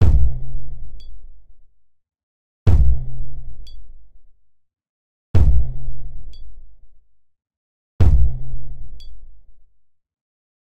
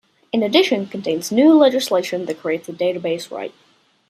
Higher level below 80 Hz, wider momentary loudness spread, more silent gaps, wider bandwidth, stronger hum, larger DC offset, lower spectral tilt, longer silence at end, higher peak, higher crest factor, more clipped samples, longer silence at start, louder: first, -24 dBFS vs -70 dBFS; first, 25 LU vs 12 LU; first, 2.23-2.66 s, 4.89-5.34 s, 7.57-7.99 s vs none; second, 4.9 kHz vs 15.5 kHz; neither; neither; first, -9 dB/octave vs -4.5 dB/octave; first, 1 s vs 0.6 s; about the same, -2 dBFS vs -2 dBFS; about the same, 16 dB vs 18 dB; neither; second, 0 s vs 0.35 s; second, -21 LUFS vs -18 LUFS